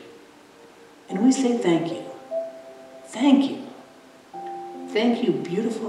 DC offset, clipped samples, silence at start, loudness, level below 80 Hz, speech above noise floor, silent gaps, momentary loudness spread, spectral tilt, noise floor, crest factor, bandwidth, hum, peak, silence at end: under 0.1%; under 0.1%; 0 s; -23 LUFS; -80 dBFS; 28 dB; none; 21 LU; -5.5 dB/octave; -49 dBFS; 20 dB; 11.5 kHz; none; -4 dBFS; 0 s